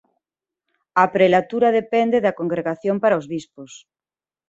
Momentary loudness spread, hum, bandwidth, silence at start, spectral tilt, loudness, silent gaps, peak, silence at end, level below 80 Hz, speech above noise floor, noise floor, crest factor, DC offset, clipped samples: 9 LU; none; 8 kHz; 0.95 s; -6.5 dB/octave; -19 LUFS; none; -2 dBFS; 0.7 s; -64 dBFS; over 71 dB; under -90 dBFS; 18 dB; under 0.1%; under 0.1%